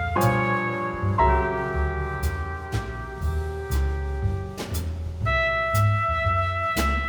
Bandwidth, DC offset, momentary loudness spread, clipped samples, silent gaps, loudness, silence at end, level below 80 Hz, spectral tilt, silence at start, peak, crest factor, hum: over 20 kHz; under 0.1%; 9 LU; under 0.1%; none; -25 LUFS; 0 s; -30 dBFS; -6 dB/octave; 0 s; -8 dBFS; 16 dB; none